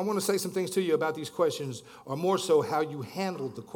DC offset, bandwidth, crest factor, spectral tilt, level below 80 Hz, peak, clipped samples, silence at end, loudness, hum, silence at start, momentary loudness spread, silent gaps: under 0.1%; 18 kHz; 16 dB; -5 dB/octave; -76 dBFS; -14 dBFS; under 0.1%; 0 s; -29 LUFS; none; 0 s; 12 LU; none